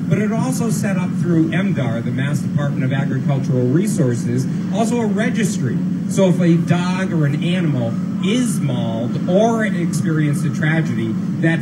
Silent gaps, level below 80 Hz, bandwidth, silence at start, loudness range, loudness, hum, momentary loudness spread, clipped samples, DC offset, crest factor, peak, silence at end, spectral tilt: none; -54 dBFS; 13 kHz; 0 s; 1 LU; -18 LUFS; none; 5 LU; under 0.1%; under 0.1%; 14 dB; -4 dBFS; 0 s; -7 dB/octave